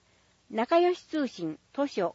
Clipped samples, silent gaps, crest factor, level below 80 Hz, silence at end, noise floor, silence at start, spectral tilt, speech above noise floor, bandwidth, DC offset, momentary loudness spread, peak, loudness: under 0.1%; none; 16 dB; -74 dBFS; 0 s; -65 dBFS; 0.5 s; -5.5 dB/octave; 37 dB; 7.8 kHz; under 0.1%; 12 LU; -14 dBFS; -29 LUFS